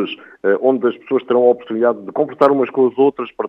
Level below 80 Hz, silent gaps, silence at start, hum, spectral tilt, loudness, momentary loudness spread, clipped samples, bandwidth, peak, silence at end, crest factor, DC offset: -70 dBFS; none; 0 s; none; -8 dB/octave; -16 LUFS; 7 LU; under 0.1%; 5.2 kHz; 0 dBFS; 0 s; 16 dB; under 0.1%